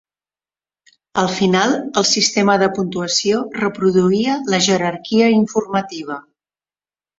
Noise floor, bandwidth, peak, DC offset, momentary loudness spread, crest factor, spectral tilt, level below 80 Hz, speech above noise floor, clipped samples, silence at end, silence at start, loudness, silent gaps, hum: under -90 dBFS; 8 kHz; 0 dBFS; under 0.1%; 8 LU; 18 dB; -4 dB/octave; -58 dBFS; over 74 dB; under 0.1%; 1 s; 1.15 s; -16 LUFS; none; none